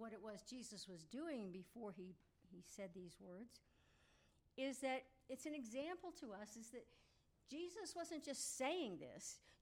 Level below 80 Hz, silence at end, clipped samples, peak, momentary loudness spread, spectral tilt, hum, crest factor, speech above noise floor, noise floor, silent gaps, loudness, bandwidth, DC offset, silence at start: -82 dBFS; 0.05 s; under 0.1%; -32 dBFS; 15 LU; -3 dB/octave; none; 20 dB; 25 dB; -77 dBFS; none; -51 LUFS; 16 kHz; under 0.1%; 0 s